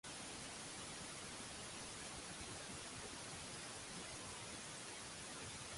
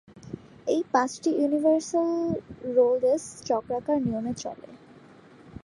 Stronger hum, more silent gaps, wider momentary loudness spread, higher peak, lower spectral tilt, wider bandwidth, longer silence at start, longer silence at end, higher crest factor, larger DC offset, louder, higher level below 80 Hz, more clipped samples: neither; neither; second, 0 LU vs 14 LU; second, -36 dBFS vs -8 dBFS; second, -2 dB/octave vs -5.5 dB/octave; about the same, 11.5 kHz vs 11.5 kHz; about the same, 0.05 s vs 0.15 s; about the same, 0 s vs 0.05 s; second, 14 dB vs 20 dB; neither; second, -49 LUFS vs -26 LUFS; second, -68 dBFS vs -60 dBFS; neither